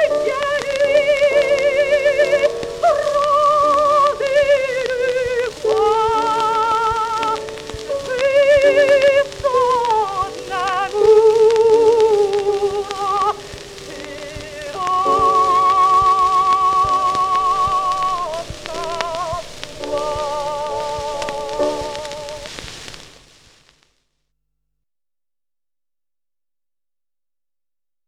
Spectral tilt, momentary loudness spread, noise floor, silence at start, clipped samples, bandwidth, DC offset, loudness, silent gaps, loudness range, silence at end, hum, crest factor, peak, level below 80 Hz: -3.5 dB/octave; 16 LU; under -90 dBFS; 0 s; under 0.1%; 14.5 kHz; under 0.1%; -16 LUFS; none; 10 LU; 5 s; none; 16 dB; 0 dBFS; -46 dBFS